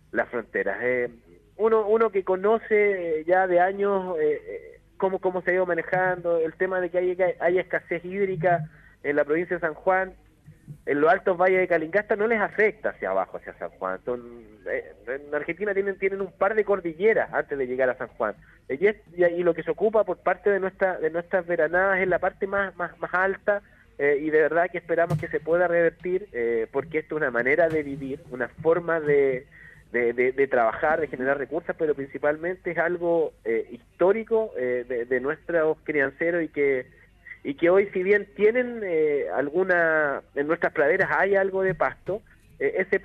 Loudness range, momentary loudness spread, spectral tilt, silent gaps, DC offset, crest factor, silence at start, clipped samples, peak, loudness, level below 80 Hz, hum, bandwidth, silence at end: 3 LU; 9 LU; -8 dB/octave; none; under 0.1%; 16 dB; 0.15 s; under 0.1%; -8 dBFS; -25 LUFS; -58 dBFS; none; 5.2 kHz; 0 s